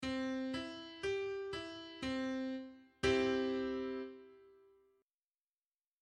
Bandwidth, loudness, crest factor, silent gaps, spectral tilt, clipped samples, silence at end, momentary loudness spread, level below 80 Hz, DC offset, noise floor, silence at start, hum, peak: 11 kHz; -39 LUFS; 20 dB; none; -5 dB/octave; under 0.1%; 1.5 s; 13 LU; -64 dBFS; under 0.1%; under -90 dBFS; 0 s; none; -22 dBFS